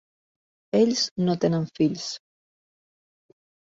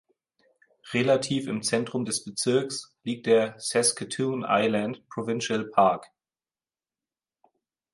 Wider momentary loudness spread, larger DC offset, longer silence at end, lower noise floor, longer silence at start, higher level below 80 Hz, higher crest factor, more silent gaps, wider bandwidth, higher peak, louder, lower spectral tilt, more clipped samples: about the same, 11 LU vs 10 LU; neither; second, 1.5 s vs 1.9 s; about the same, under -90 dBFS vs under -90 dBFS; about the same, 0.75 s vs 0.85 s; about the same, -66 dBFS vs -70 dBFS; about the same, 18 dB vs 20 dB; first, 1.11-1.16 s vs none; second, 7.8 kHz vs 11.5 kHz; about the same, -8 dBFS vs -8 dBFS; about the same, -24 LUFS vs -26 LUFS; first, -5.5 dB/octave vs -4 dB/octave; neither